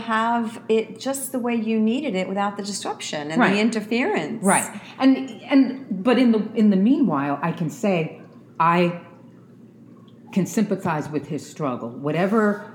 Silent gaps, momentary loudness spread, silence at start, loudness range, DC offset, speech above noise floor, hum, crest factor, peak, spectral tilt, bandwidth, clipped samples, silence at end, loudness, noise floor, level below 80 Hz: none; 10 LU; 0 s; 5 LU; under 0.1%; 25 dB; none; 20 dB; -2 dBFS; -5.5 dB/octave; 18.5 kHz; under 0.1%; 0 s; -22 LUFS; -47 dBFS; -70 dBFS